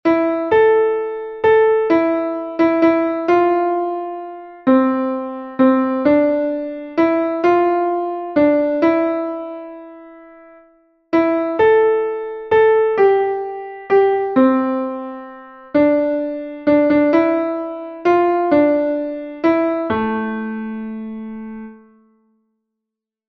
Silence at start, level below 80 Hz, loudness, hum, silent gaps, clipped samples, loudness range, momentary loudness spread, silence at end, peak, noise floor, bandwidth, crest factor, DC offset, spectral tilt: 0.05 s; -56 dBFS; -17 LUFS; none; none; under 0.1%; 5 LU; 14 LU; 1.55 s; -2 dBFS; -83 dBFS; 6 kHz; 14 dB; under 0.1%; -8 dB/octave